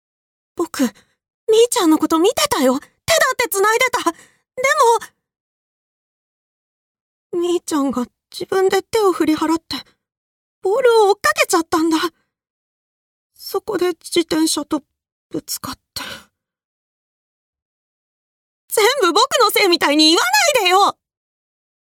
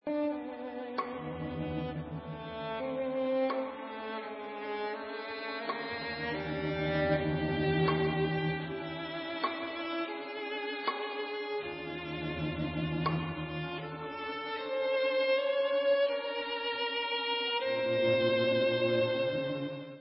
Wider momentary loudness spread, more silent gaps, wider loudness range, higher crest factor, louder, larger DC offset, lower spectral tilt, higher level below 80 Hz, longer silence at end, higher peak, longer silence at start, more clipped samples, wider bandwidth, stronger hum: first, 15 LU vs 11 LU; first, 1.30-1.47 s, 5.40-6.95 s, 7.01-7.30 s, 10.17-10.62 s, 12.50-13.30 s, 15.12-15.30 s, 16.65-17.53 s, 17.62-18.68 s vs none; first, 11 LU vs 6 LU; about the same, 16 dB vs 16 dB; first, -16 LUFS vs -33 LUFS; neither; second, -2 dB/octave vs -3.5 dB/octave; about the same, -58 dBFS vs -56 dBFS; first, 1 s vs 0 s; first, -2 dBFS vs -16 dBFS; first, 0.55 s vs 0.05 s; neither; first, 19.5 kHz vs 5.6 kHz; neither